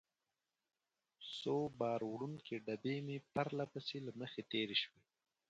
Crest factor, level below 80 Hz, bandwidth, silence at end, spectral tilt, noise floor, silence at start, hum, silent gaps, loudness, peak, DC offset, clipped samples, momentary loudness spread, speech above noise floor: 22 dB; -82 dBFS; 9 kHz; 0.6 s; -6 dB/octave; under -90 dBFS; 1.2 s; none; none; -43 LUFS; -22 dBFS; under 0.1%; under 0.1%; 9 LU; over 48 dB